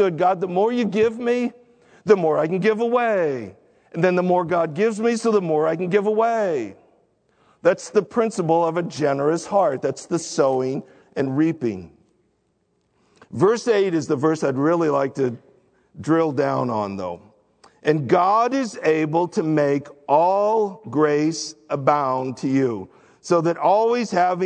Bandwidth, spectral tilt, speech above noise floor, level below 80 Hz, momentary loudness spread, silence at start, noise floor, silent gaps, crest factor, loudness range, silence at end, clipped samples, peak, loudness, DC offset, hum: 9.4 kHz; -6 dB/octave; 48 dB; -68 dBFS; 9 LU; 0 s; -68 dBFS; none; 20 dB; 3 LU; 0 s; under 0.1%; -2 dBFS; -21 LUFS; under 0.1%; none